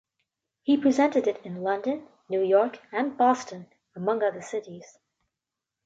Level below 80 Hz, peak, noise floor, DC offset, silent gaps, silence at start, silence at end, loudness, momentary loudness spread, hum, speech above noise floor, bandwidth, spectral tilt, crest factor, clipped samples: -76 dBFS; -10 dBFS; -88 dBFS; under 0.1%; none; 0.65 s; 1 s; -26 LUFS; 16 LU; none; 62 dB; 7.8 kHz; -5.5 dB/octave; 18 dB; under 0.1%